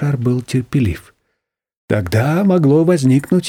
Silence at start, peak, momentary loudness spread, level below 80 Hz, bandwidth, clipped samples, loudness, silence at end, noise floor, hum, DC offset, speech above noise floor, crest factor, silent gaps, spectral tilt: 0 s; -2 dBFS; 8 LU; -42 dBFS; 16 kHz; under 0.1%; -15 LUFS; 0 s; -74 dBFS; none; under 0.1%; 59 dB; 14 dB; 1.77-1.88 s; -7.5 dB/octave